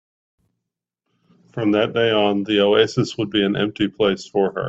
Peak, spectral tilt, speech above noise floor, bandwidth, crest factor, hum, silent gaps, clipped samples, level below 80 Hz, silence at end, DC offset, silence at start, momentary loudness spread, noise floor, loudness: -2 dBFS; -6 dB/octave; 63 dB; 8 kHz; 18 dB; none; none; under 0.1%; -58 dBFS; 0 s; under 0.1%; 1.55 s; 6 LU; -82 dBFS; -19 LUFS